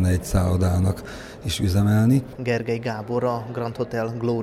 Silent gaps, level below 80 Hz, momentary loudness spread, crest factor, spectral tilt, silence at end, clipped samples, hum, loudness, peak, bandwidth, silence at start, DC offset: none; -38 dBFS; 10 LU; 14 dB; -6.5 dB/octave; 0 s; under 0.1%; none; -23 LUFS; -8 dBFS; 15 kHz; 0 s; under 0.1%